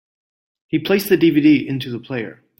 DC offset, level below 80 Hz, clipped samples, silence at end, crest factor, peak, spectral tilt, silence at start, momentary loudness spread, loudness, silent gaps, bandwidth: under 0.1%; -58 dBFS; under 0.1%; 0.25 s; 16 dB; -4 dBFS; -6.5 dB/octave; 0.75 s; 13 LU; -17 LUFS; none; 16.5 kHz